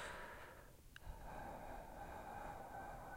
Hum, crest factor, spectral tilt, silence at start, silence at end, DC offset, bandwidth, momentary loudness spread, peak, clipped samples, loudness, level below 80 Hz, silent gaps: none; 14 dB; -4.5 dB/octave; 0 s; 0 s; under 0.1%; 16 kHz; 7 LU; -38 dBFS; under 0.1%; -54 LUFS; -60 dBFS; none